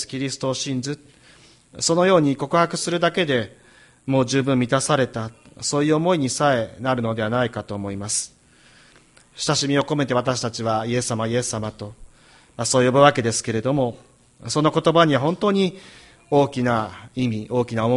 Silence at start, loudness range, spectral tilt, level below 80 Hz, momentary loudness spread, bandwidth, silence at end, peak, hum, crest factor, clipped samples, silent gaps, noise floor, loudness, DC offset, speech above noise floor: 0 s; 4 LU; -4.5 dB/octave; -54 dBFS; 12 LU; 11.5 kHz; 0 s; -2 dBFS; none; 20 dB; under 0.1%; none; -53 dBFS; -21 LUFS; under 0.1%; 32 dB